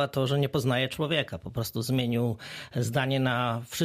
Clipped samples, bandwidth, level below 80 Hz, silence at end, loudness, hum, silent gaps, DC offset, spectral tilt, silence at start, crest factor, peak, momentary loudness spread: under 0.1%; 15.5 kHz; -58 dBFS; 0 s; -28 LUFS; none; none; under 0.1%; -5.5 dB/octave; 0 s; 16 dB; -12 dBFS; 7 LU